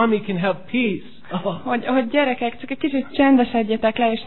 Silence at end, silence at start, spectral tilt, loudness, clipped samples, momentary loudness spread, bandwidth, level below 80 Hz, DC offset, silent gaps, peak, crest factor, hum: 0 s; 0 s; -9.5 dB/octave; -20 LUFS; under 0.1%; 10 LU; 4.3 kHz; -52 dBFS; 1%; none; -4 dBFS; 16 dB; none